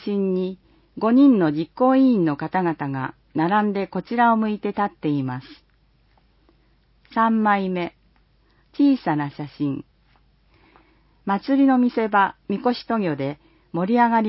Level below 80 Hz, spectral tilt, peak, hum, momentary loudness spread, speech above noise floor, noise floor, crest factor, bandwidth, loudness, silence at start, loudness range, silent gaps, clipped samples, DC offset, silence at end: -60 dBFS; -11.5 dB/octave; -6 dBFS; none; 13 LU; 40 dB; -60 dBFS; 16 dB; 5.8 kHz; -21 LUFS; 0 s; 6 LU; none; under 0.1%; under 0.1%; 0 s